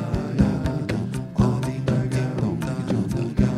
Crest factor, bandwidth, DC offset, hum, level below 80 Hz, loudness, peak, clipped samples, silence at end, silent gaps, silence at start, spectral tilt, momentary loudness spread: 18 dB; 13 kHz; under 0.1%; none; -36 dBFS; -24 LUFS; -6 dBFS; under 0.1%; 0 s; none; 0 s; -8 dB/octave; 5 LU